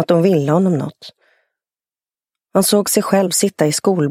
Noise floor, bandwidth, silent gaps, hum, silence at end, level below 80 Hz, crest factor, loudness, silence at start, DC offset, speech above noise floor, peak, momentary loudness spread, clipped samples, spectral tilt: under -90 dBFS; 16.5 kHz; none; none; 0 s; -62 dBFS; 16 dB; -15 LUFS; 0 s; under 0.1%; over 75 dB; 0 dBFS; 6 LU; under 0.1%; -5 dB/octave